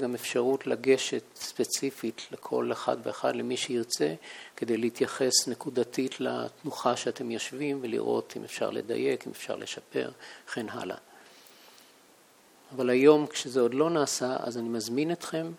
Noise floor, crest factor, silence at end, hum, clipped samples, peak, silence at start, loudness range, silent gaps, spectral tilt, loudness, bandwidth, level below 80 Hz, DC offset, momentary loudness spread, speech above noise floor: -59 dBFS; 22 dB; 0 s; none; under 0.1%; -8 dBFS; 0 s; 8 LU; none; -3.5 dB/octave; -29 LUFS; 18.5 kHz; -80 dBFS; under 0.1%; 12 LU; 30 dB